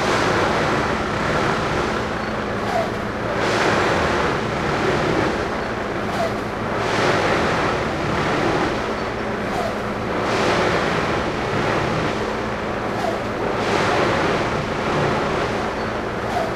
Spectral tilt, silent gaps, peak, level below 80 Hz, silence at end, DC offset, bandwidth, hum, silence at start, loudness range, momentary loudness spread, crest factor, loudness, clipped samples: -5 dB/octave; none; -4 dBFS; -38 dBFS; 0 s; under 0.1%; 15 kHz; none; 0 s; 1 LU; 6 LU; 16 dB; -21 LUFS; under 0.1%